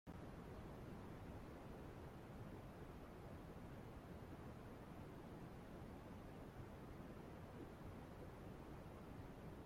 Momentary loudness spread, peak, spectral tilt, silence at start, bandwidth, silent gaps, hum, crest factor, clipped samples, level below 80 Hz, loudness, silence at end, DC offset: 1 LU; -44 dBFS; -7 dB/octave; 0.05 s; 16.5 kHz; none; none; 12 dB; under 0.1%; -64 dBFS; -57 LUFS; 0 s; under 0.1%